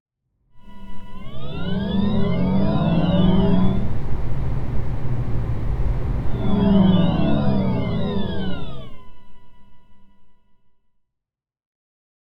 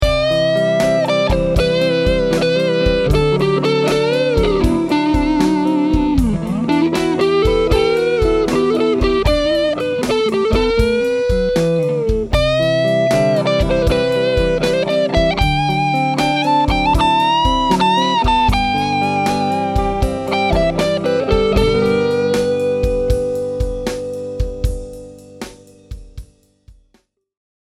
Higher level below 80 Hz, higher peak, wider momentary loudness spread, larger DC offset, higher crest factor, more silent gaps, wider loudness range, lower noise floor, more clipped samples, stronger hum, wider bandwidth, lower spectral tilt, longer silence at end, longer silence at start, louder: about the same, -30 dBFS vs -26 dBFS; second, -4 dBFS vs 0 dBFS; first, 16 LU vs 5 LU; neither; about the same, 16 dB vs 14 dB; neither; first, 8 LU vs 5 LU; first, -84 dBFS vs -59 dBFS; neither; neither; second, 5.4 kHz vs 14.5 kHz; first, -9.5 dB/octave vs -6 dB/octave; first, 1.95 s vs 1 s; first, 0.55 s vs 0 s; second, -22 LUFS vs -16 LUFS